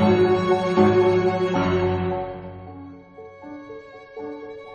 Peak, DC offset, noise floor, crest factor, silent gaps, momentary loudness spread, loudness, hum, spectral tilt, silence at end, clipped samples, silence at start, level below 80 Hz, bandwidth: -4 dBFS; under 0.1%; -43 dBFS; 18 dB; none; 23 LU; -20 LUFS; none; -7.5 dB/octave; 0 s; under 0.1%; 0 s; -50 dBFS; 7 kHz